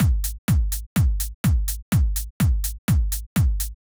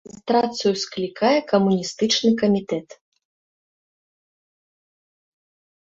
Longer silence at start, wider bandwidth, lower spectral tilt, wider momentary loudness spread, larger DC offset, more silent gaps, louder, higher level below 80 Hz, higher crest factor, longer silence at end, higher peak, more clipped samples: second, 0 s vs 0.25 s; first, over 20 kHz vs 7.8 kHz; about the same, -5.5 dB/octave vs -4.5 dB/octave; second, 3 LU vs 8 LU; neither; first, 0.38-0.48 s, 0.86-0.96 s, 1.34-1.44 s, 1.82-1.92 s, 2.30-2.40 s, 2.78-2.88 s, 3.26-3.36 s vs none; about the same, -23 LUFS vs -21 LUFS; first, -24 dBFS vs -64 dBFS; second, 12 dB vs 18 dB; second, 0.1 s vs 3.05 s; second, -10 dBFS vs -4 dBFS; neither